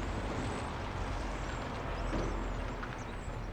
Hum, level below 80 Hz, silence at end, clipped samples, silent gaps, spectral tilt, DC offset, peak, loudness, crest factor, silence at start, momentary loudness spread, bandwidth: none; -42 dBFS; 0 s; under 0.1%; none; -5.5 dB/octave; under 0.1%; -24 dBFS; -39 LUFS; 14 dB; 0 s; 5 LU; 9.8 kHz